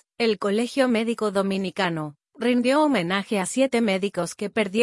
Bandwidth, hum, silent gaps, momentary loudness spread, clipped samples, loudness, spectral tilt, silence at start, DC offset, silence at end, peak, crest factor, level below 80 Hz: 12 kHz; none; none; 7 LU; under 0.1%; -23 LUFS; -5 dB/octave; 0.2 s; under 0.1%; 0 s; -6 dBFS; 16 dB; -68 dBFS